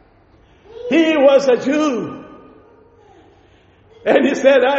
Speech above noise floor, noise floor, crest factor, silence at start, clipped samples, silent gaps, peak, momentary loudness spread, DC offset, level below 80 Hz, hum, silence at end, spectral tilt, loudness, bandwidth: 36 dB; -50 dBFS; 16 dB; 0.75 s; under 0.1%; none; 0 dBFS; 17 LU; under 0.1%; -58 dBFS; none; 0 s; -2.5 dB/octave; -15 LUFS; 8 kHz